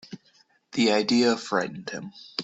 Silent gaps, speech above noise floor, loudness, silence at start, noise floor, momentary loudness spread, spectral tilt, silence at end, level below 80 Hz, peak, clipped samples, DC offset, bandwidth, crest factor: none; 38 dB; -25 LUFS; 0.1 s; -63 dBFS; 18 LU; -4 dB/octave; 0 s; -68 dBFS; -8 dBFS; under 0.1%; under 0.1%; 8.2 kHz; 18 dB